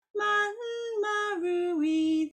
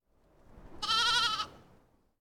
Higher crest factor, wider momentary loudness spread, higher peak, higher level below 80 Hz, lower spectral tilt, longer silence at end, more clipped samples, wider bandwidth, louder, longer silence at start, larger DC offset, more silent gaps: second, 12 dB vs 18 dB; second, 5 LU vs 13 LU; about the same, -18 dBFS vs -16 dBFS; second, -78 dBFS vs -58 dBFS; first, -3 dB/octave vs 0 dB/octave; second, 0.05 s vs 0.65 s; neither; second, 9.8 kHz vs 19 kHz; about the same, -28 LUFS vs -29 LUFS; second, 0.15 s vs 0.55 s; neither; neither